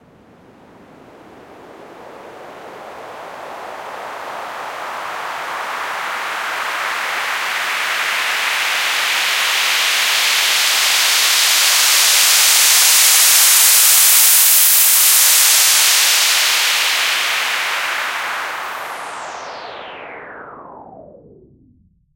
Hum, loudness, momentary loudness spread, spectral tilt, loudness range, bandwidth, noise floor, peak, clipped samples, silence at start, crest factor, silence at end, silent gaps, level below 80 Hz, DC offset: none; -11 LUFS; 22 LU; 3.5 dB/octave; 21 LU; over 20 kHz; -54 dBFS; 0 dBFS; under 0.1%; 1.5 s; 16 dB; 1.15 s; none; -68 dBFS; under 0.1%